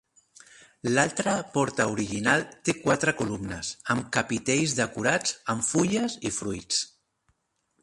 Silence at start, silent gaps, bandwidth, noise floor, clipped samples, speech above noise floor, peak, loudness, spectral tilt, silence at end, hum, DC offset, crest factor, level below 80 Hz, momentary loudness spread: 0.85 s; none; 11.5 kHz; -74 dBFS; under 0.1%; 47 dB; -6 dBFS; -26 LUFS; -3.5 dB/octave; 0.95 s; none; under 0.1%; 22 dB; -58 dBFS; 7 LU